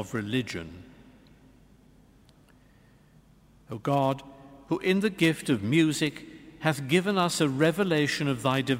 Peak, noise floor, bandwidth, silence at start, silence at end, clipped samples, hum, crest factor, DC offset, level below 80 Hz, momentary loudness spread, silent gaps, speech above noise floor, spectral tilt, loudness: -8 dBFS; -58 dBFS; 16 kHz; 0 s; 0 s; under 0.1%; none; 20 dB; under 0.1%; -62 dBFS; 13 LU; none; 32 dB; -5.5 dB/octave; -27 LUFS